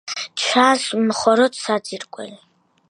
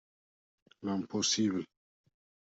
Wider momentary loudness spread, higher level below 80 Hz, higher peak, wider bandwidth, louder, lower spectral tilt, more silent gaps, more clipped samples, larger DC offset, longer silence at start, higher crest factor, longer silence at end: first, 18 LU vs 13 LU; first, -68 dBFS vs -78 dBFS; first, 0 dBFS vs -18 dBFS; first, 11.5 kHz vs 8.2 kHz; first, -18 LUFS vs -33 LUFS; about the same, -3 dB/octave vs -3.5 dB/octave; neither; neither; neither; second, 0.05 s vs 0.8 s; about the same, 20 dB vs 20 dB; second, 0.55 s vs 0.85 s